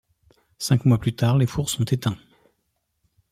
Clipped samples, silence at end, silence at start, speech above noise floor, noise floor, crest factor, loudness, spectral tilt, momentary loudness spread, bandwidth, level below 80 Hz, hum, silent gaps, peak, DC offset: under 0.1%; 1.15 s; 0.6 s; 53 dB; -74 dBFS; 18 dB; -22 LUFS; -6 dB/octave; 10 LU; 15.5 kHz; -50 dBFS; none; none; -6 dBFS; under 0.1%